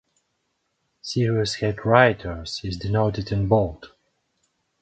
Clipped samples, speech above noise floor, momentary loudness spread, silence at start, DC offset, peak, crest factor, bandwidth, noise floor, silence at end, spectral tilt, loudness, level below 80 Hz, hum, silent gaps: under 0.1%; 52 dB; 13 LU; 1.05 s; under 0.1%; 0 dBFS; 24 dB; 9 kHz; -74 dBFS; 0.95 s; -6 dB/octave; -22 LUFS; -44 dBFS; none; none